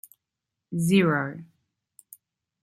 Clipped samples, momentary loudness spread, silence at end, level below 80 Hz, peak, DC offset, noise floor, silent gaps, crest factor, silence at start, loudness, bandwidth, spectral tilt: under 0.1%; 15 LU; 1.2 s; -66 dBFS; -10 dBFS; under 0.1%; -86 dBFS; none; 20 dB; 0.7 s; -24 LUFS; 16 kHz; -6 dB/octave